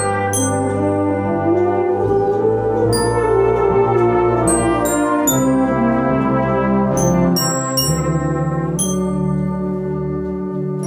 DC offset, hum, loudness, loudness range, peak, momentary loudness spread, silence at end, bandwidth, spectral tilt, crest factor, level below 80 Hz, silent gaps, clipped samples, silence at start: under 0.1%; none; -17 LUFS; 3 LU; -4 dBFS; 6 LU; 0 s; 17 kHz; -5.5 dB/octave; 12 dB; -36 dBFS; none; under 0.1%; 0 s